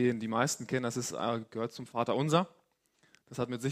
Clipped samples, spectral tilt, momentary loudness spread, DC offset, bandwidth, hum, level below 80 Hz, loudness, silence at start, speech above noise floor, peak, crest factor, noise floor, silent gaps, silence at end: under 0.1%; -5 dB/octave; 9 LU; under 0.1%; 15.5 kHz; none; -72 dBFS; -33 LUFS; 0 s; 39 dB; -10 dBFS; 22 dB; -71 dBFS; none; 0 s